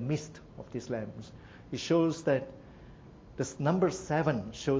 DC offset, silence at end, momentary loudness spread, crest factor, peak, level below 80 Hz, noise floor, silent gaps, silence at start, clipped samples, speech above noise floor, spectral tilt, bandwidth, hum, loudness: under 0.1%; 0 s; 23 LU; 18 dB; -14 dBFS; -58 dBFS; -52 dBFS; none; 0 s; under 0.1%; 20 dB; -6 dB/octave; 8 kHz; none; -32 LUFS